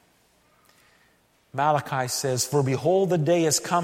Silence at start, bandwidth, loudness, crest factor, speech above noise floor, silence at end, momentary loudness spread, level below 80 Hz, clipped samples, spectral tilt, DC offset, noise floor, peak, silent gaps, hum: 1.55 s; 16.5 kHz; -23 LUFS; 16 dB; 40 dB; 0 s; 5 LU; -66 dBFS; under 0.1%; -4.5 dB/octave; under 0.1%; -63 dBFS; -8 dBFS; none; none